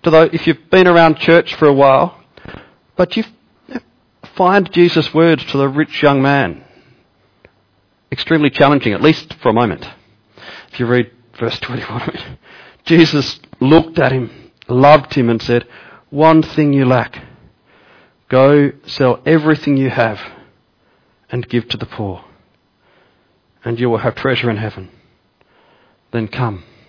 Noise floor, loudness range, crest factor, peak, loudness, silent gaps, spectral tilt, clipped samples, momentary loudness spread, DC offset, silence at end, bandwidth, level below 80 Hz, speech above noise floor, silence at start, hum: -58 dBFS; 8 LU; 14 dB; 0 dBFS; -13 LUFS; none; -7.5 dB/octave; under 0.1%; 18 LU; under 0.1%; 0.3 s; 5.4 kHz; -46 dBFS; 45 dB; 0.05 s; none